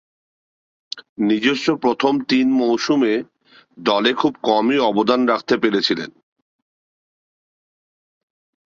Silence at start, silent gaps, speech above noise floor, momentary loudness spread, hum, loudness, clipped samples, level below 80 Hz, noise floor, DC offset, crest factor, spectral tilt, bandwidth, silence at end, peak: 0.95 s; 1.09-1.16 s; over 72 dB; 8 LU; none; -18 LUFS; under 0.1%; -64 dBFS; under -90 dBFS; under 0.1%; 18 dB; -5 dB/octave; 7.6 kHz; 2.6 s; -2 dBFS